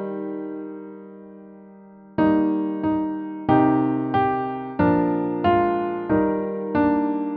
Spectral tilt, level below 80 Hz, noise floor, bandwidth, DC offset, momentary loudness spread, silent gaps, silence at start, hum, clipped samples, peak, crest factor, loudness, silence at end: -7 dB/octave; -52 dBFS; -45 dBFS; 4.7 kHz; under 0.1%; 14 LU; none; 0 s; none; under 0.1%; -6 dBFS; 16 dB; -22 LUFS; 0 s